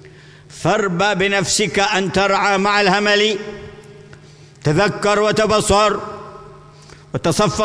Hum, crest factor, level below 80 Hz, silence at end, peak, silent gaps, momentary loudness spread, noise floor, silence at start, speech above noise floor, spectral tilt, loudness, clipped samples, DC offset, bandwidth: none; 16 dB; -42 dBFS; 0 s; -2 dBFS; none; 13 LU; -42 dBFS; 0.05 s; 26 dB; -4 dB/octave; -16 LUFS; under 0.1%; under 0.1%; 11 kHz